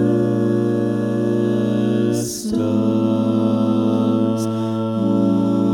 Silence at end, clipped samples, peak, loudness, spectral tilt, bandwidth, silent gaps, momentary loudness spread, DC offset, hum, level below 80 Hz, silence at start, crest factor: 0 s; under 0.1%; -6 dBFS; -19 LUFS; -7 dB/octave; 17 kHz; none; 4 LU; under 0.1%; none; -56 dBFS; 0 s; 12 dB